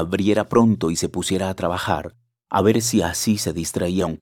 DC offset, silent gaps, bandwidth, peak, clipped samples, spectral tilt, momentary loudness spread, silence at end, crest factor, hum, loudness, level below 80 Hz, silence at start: under 0.1%; none; 17.5 kHz; -2 dBFS; under 0.1%; -5 dB/octave; 7 LU; 0.05 s; 18 dB; none; -21 LUFS; -50 dBFS; 0 s